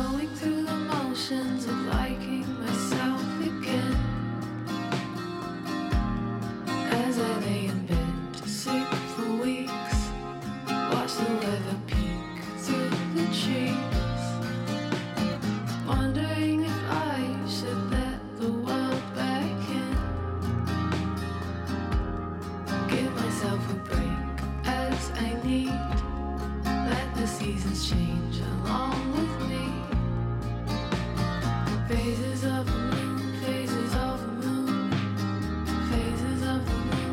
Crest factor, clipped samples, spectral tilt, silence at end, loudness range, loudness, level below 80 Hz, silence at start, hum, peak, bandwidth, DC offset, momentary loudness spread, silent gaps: 16 dB; under 0.1%; -6 dB/octave; 0 s; 1 LU; -29 LUFS; -38 dBFS; 0 s; none; -12 dBFS; 16 kHz; under 0.1%; 5 LU; none